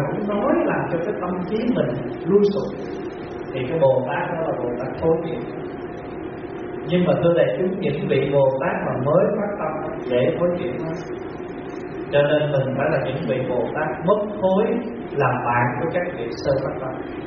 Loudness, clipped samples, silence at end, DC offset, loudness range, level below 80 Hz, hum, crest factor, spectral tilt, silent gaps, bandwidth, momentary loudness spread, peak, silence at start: -22 LUFS; under 0.1%; 0 s; under 0.1%; 3 LU; -50 dBFS; none; 18 dB; -6 dB/octave; none; 6.2 kHz; 13 LU; -4 dBFS; 0 s